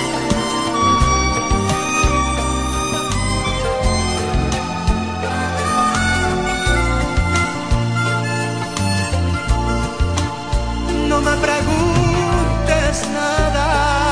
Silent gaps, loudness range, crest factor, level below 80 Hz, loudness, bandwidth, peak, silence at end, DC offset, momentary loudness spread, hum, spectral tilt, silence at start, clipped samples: none; 2 LU; 14 dB; -24 dBFS; -18 LUFS; 10.5 kHz; -2 dBFS; 0 s; under 0.1%; 5 LU; none; -4.5 dB/octave; 0 s; under 0.1%